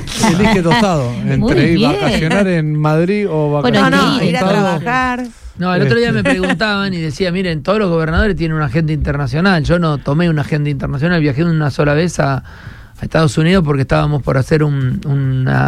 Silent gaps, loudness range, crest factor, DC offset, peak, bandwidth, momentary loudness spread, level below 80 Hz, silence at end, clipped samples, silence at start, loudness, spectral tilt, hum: none; 2 LU; 12 dB; under 0.1%; 0 dBFS; 13 kHz; 6 LU; -30 dBFS; 0 s; under 0.1%; 0 s; -14 LUFS; -6.5 dB/octave; none